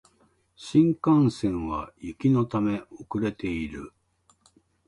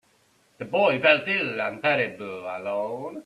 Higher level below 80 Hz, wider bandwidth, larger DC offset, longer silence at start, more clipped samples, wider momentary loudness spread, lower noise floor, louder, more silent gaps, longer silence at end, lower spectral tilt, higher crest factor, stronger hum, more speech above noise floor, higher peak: first, -50 dBFS vs -70 dBFS; about the same, 11 kHz vs 11 kHz; neither; about the same, 0.6 s vs 0.6 s; neither; first, 16 LU vs 13 LU; about the same, -65 dBFS vs -63 dBFS; about the same, -26 LUFS vs -24 LUFS; neither; first, 1 s vs 0.05 s; first, -8 dB/octave vs -5.5 dB/octave; about the same, 18 dB vs 22 dB; neither; about the same, 40 dB vs 38 dB; second, -8 dBFS vs -4 dBFS